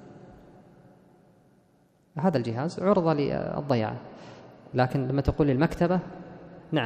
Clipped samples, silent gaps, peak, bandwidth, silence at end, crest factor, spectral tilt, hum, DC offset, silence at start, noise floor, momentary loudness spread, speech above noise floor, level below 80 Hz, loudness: under 0.1%; none; -8 dBFS; 9.6 kHz; 0 s; 20 dB; -8 dB/octave; none; under 0.1%; 0 s; -63 dBFS; 21 LU; 37 dB; -46 dBFS; -27 LUFS